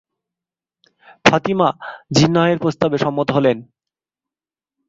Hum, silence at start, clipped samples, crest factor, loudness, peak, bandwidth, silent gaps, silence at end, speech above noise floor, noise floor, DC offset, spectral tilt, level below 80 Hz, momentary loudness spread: none; 1.25 s; under 0.1%; 18 dB; -17 LUFS; 0 dBFS; 7.8 kHz; none; 1.25 s; over 73 dB; under -90 dBFS; under 0.1%; -5.5 dB/octave; -52 dBFS; 5 LU